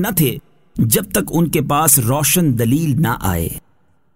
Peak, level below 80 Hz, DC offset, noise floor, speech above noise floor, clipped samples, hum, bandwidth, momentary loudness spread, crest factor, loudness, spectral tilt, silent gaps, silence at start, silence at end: 0 dBFS; -38 dBFS; 0.3%; -60 dBFS; 45 dB; under 0.1%; none; 16.5 kHz; 12 LU; 16 dB; -15 LUFS; -4.5 dB/octave; none; 0 s; 0.55 s